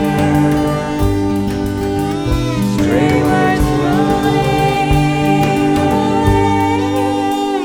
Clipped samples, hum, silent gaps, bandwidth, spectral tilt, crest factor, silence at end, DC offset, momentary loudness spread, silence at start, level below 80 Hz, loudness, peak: under 0.1%; none; none; 18.5 kHz; -6.5 dB/octave; 12 dB; 0 s; 0.1%; 4 LU; 0 s; -28 dBFS; -14 LUFS; 0 dBFS